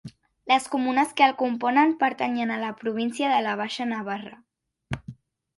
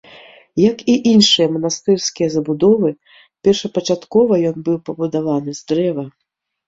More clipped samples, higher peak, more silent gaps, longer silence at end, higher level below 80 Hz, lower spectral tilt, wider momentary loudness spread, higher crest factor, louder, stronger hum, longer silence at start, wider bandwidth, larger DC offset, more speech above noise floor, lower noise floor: neither; second, -4 dBFS vs 0 dBFS; neither; second, 0.45 s vs 0.6 s; about the same, -58 dBFS vs -56 dBFS; about the same, -4.5 dB/octave vs -5 dB/octave; first, 15 LU vs 10 LU; first, 22 dB vs 16 dB; second, -24 LUFS vs -16 LUFS; neither; second, 0.05 s vs 0.55 s; first, 11.5 kHz vs 7.8 kHz; neither; second, 21 dB vs 27 dB; about the same, -45 dBFS vs -43 dBFS